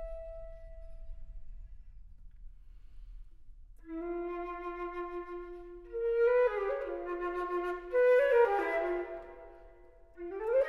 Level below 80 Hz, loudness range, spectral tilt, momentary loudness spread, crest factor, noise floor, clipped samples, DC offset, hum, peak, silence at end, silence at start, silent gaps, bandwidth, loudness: -52 dBFS; 16 LU; -6.5 dB/octave; 27 LU; 18 dB; -56 dBFS; under 0.1%; under 0.1%; none; -16 dBFS; 0 s; 0 s; none; 5.8 kHz; -32 LUFS